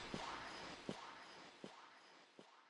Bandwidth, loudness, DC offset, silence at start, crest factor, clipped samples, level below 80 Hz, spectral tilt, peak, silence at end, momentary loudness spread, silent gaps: 11 kHz; -53 LUFS; under 0.1%; 0 s; 24 dB; under 0.1%; -74 dBFS; -3.5 dB/octave; -30 dBFS; 0 s; 15 LU; none